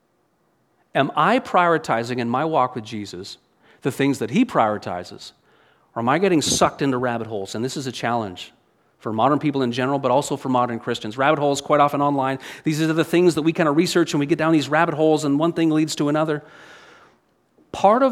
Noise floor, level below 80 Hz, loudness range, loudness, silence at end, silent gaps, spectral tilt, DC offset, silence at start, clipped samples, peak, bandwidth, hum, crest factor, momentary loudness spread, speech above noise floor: -65 dBFS; -60 dBFS; 4 LU; -20 LUFS; 0 s; none; -5 dB/octave; under 0.1%; 0.95 s; under 0.1%; -2 dBFS; 15.5 kHz; none; 20 dB; 13 LU; 45 dB